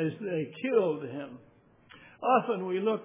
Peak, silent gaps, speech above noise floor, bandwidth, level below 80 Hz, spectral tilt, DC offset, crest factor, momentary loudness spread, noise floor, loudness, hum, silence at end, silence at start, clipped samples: -12 dBFS; none; 28 dB; 3.8 kHz; -78 dBFS; -10 dB/octave; under 0.1%; 18 dB; 13 LU; -57 dBFS; -30 LUFS; none; 0 s; 0 s; under 0.1%